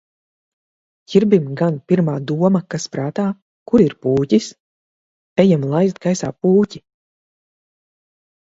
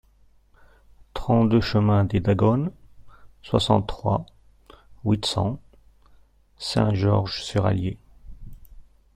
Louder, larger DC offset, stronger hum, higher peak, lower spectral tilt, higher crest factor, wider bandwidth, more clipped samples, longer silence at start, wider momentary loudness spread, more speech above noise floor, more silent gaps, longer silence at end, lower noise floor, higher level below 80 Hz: first, -17 LUFS vs -23 LUFS; neither; neither; first, 0 dBFS vs -4 dBFS; about the same, -7 dB/octave vs -7 dB/octave; about the same, 18 dB vs 20 dB; second, 8 kHz vs 10.5 kHz; neither; about the same, 1.1 s vs 1.15 s; second, 9 LU vs 12 LU; first, over 74 dB vs 36 dB; first, 3.42-3.66 s, 4.60-5.36 s vs none; first, 1.65 s vs 0.35 s; first, under -90 dBFS vs -57 dBFS; second, -56 dBFS vs -44 dBFS